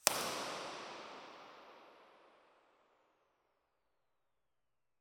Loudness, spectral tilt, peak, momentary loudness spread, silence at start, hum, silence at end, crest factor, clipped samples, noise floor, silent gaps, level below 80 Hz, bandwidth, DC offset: -42 LUFS; -0.5 dB/octave; -2 dBFS; 23 LU; 0.05 s; none; 2.65 s; 44 dB; under 0.1%; under -90 dBFS; none; -86 dBFS; 18 kHz; under 0.1%